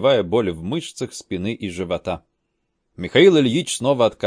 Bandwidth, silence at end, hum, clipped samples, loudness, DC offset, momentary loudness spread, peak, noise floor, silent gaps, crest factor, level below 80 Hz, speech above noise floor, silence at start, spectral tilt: 10.5 kHz; 0 s; none; under 0.1%; -20 LUFS; under 0.1%; 16 LU; 0 dBFS; -73 dBFS; none; 20 dB; -52 dBFS; 54 dB; 0 s; -5 dB/octave